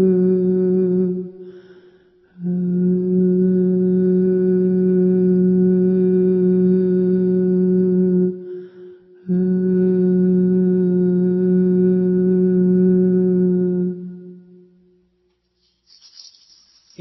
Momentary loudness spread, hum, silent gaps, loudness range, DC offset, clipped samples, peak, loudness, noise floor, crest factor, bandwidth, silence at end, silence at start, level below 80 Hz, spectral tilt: 7 LU; none; none; 4 LU; under 0.1%; under 0.1%; -6 dBFS; -17 LUFS; -66 dBFS; 10 dB; 5.8 kHz; 2.6 s; 0 s; -56 dBFS; -11.5 dB/octave